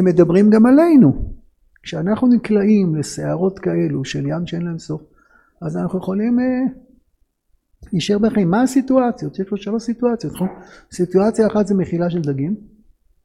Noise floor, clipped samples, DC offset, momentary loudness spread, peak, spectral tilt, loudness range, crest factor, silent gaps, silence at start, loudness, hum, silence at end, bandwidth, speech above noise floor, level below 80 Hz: -63 dBFS; under 0.1%; under 0.1%; 14 LU; 0 dBFS; -7.5 dB/octave; 8 LU; 16 dB; none; 0 s; -17 LUFS; none; 0.65 s; 13 kHz; 47 dB; -42 dBFS